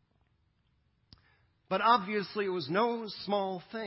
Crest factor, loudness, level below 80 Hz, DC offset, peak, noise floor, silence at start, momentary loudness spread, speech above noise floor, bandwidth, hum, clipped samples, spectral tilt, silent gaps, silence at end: 22 dB; -31 LUFS; -74 dBFS; under 0.1%; -12 dBFS; -73 dBFS; 1.7 s; 9 LU; 42 dB; 5.8 kHz; none; under 0.1%; -8.5 dB/octave; none; 0 s